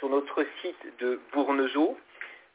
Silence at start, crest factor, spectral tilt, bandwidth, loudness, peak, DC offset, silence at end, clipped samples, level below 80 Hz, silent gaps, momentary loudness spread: 0 s; 16 dB; -0.5 dB/octave; 4 kHz; -29 LUFS; -14 dBFS; under 0.1%; 0.15 s; under 0.1%; -78 dBFS; none; 14 LU